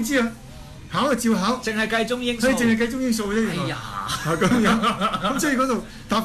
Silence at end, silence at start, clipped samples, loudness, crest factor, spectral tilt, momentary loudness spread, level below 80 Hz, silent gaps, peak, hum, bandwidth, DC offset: 0 s; 0 s; under 0.1%; -22 LUFS; 14 dB; -4.5 dB/octave; 9 LU; -44 dBFS; none; -8 dBFS; none; 14 kHz; under 0.1%